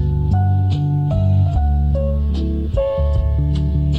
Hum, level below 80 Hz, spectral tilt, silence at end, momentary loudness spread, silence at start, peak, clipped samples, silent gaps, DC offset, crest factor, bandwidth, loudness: none; -20 dBFS; -10 dB/octave; 0 s; 4 LU; 0 s; -6 dBFS; under 0.1%; none; under 0.1%; 10 dB; 5.2 kHz; -18 LUFS